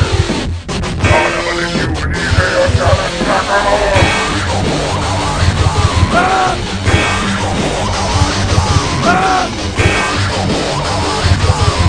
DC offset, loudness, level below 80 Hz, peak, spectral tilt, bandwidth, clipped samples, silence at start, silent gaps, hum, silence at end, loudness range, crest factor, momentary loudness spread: 0.6%; -13 LUFS; -24 dBFS; 0 dBFS; -4.5 dB/octave; 10.5 kHz; under 0.1%; 0 s; none; none; 0 s; 1 LU; 12 dB; 4 LU